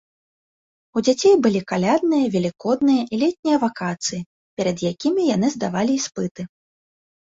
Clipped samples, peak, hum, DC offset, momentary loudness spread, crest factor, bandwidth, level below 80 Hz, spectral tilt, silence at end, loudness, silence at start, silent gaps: under 0.1%; -4 dBFS; none; under 0.1%; 11 LU; 16 dB; 8 kHz; -60 dBFS; -5 dB/octave; 0.75 s; -20 LUFS; 0.95 s; 3.39-3.43 s, 4.26-4.57 s, 6.31-6.35 s